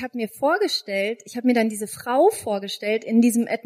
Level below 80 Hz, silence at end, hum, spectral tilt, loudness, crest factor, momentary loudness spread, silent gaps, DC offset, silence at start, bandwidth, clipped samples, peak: -70 dBFS; 0.05 s; none; -4 dB/octave; -22 LUFS; 16 dB; 8 LU; none; under 0.1%; 0 s; 15.5 kHz; under 0.1%; -6 dBFS